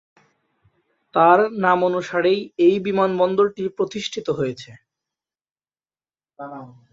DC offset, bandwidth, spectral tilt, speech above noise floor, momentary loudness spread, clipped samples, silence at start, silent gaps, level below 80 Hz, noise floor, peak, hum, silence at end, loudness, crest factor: under 0.1%; 7.8 kHz; -6 dB/octave; over 70 dB; 21 LU; under 0.1%; 1.15 s; 5.51-5.55 s; -64 dBFS; under -90 dBFS; -2 dBFS; none; 0.25 s; -19 LUFS; 20 dB